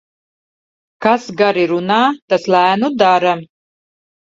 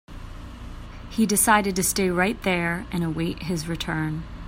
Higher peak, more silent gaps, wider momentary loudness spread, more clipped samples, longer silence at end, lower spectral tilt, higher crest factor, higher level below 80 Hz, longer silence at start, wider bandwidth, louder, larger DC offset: first, 0 dBFS vs -4 dBFS; first, 2.22-2.28 s vs none; second, 6 LU vs 22 LU; neither; first, 0.8 s vs 0 s; first, -5.5 dB/octave vs -4 dB/octave; about the same, 16 dB vs 20 dB; second, -62 dBFS vs -40 dBFS; first, 1 s vs 0.1 s; second, 7.8 kHz vs 16 kHz; first, -14 LUFS vs -23 LUFS; neither